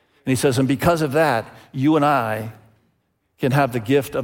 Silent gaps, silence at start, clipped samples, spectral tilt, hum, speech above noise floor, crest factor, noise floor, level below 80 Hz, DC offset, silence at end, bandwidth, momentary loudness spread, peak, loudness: none; 0.25 s; under 0.1%; -6 dB/octave; none; 49 dB; 16 dB; -68 dBFS; -50 dBFS; under 0.1%; 0 s; 17 kHz; 8 LU; -4 dBFS; -20 LUFS